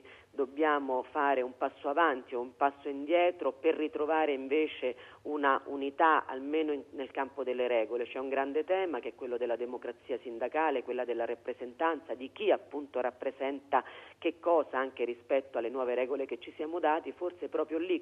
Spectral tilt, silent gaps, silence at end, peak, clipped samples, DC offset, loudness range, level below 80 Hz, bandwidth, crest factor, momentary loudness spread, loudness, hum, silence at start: -5.5 dB/octave; none; 0 s; -12 dBFS; under 0.1%; under 0.1%; 3 LU; -78 dBFS; 5.6 kHz; 20 dB; 10 LU; -33 LUFS; 50 Hz at -75 dBFS; 0.05 s